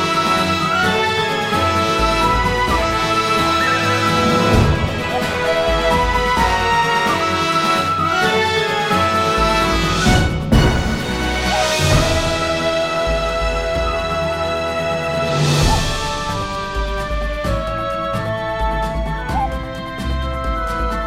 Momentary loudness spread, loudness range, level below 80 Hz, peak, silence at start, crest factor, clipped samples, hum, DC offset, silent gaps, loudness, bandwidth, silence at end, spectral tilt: 7 LU; 6 LU; -26 dBFS; -2 dBFS; 0 s; 16 dB; under 0.1%; none; under 0.1%; none; -17 LUFS; 16.5 kHz; 0 s; -4.5 dB/octave